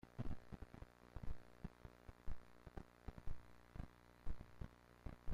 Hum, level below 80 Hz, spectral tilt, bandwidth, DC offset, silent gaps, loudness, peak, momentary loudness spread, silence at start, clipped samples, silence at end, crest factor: none; -56 dBFS; -7.5 dB/octave; 7 kHz; under 0.1%; none; -58 LUFS; -32 dBFS; 7 LU; 0.05 s; under 0.1%; 0 s; 16 dB